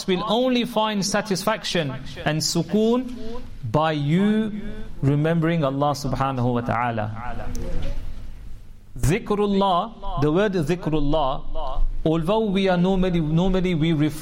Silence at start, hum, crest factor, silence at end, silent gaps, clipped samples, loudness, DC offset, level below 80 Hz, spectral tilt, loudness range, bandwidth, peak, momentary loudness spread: 0 s; none; 12 dB; 0 s; none; under 0.1%; -23 LUFS; under 0.1%; -32 dBFS; -6 dB/octave; 4 LU; 16 kHz; -8 dBFS; 13 LU